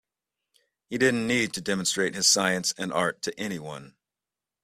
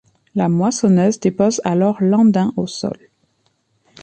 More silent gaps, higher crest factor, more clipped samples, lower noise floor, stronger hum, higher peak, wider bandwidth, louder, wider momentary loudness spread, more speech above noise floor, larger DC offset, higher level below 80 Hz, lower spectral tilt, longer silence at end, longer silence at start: neither; first, 20 dB vs 14 dB; neither; first, -90 dBFS vs -64 dBFS; neither; second, -8 dBFS vs -2 dBFS; first, 15.5 kHz vs 9 kHz; second, -25 LUFS vs -17 LUFS; first, 15 LU vs 12 LU; first, 63 dB vs 49 dB; neither; second, -66 dBFS vs -58 dBFS; second, -2.5 dB/octave vs -6.5 dB/octave; second, 0.8 s vs 1.1 s; first, 0.9 s vs 0.35 s